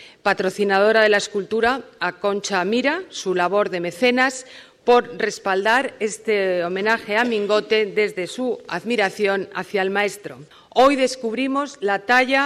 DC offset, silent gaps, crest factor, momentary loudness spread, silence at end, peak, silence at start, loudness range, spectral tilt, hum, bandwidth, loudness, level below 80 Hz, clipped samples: under 0.1%; none; 14 dB; 9 LU; 0 s; -6 dBFS; 0 s; 2 LU; -3.5 dB/octave; none; 14 kHz; -20 LUFS; -60 dBFS; under 0.1%